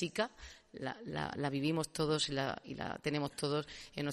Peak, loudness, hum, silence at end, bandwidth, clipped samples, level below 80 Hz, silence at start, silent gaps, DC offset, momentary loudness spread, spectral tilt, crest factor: -20 dBFS; -38 LUFS; none; 0 s; 13.5 kHz; under 0.1%; -64 dBFS; 0 s; none; under 0.1%; 11 LU; -4.5 dB/octave; 18 dB